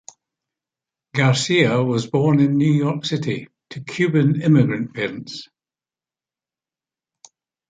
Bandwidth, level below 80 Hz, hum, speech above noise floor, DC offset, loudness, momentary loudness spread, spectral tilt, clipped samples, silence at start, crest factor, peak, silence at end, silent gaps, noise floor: 9.4 kHz; -60 dBFS; none; over 72 dB; under 0.1%; -19 LUFS; 15 LU; -6 dB/octave; under 0.1%; 1.15 s; 18 dB; -4 dBFS; 2.25 s; none; under -90 dBFS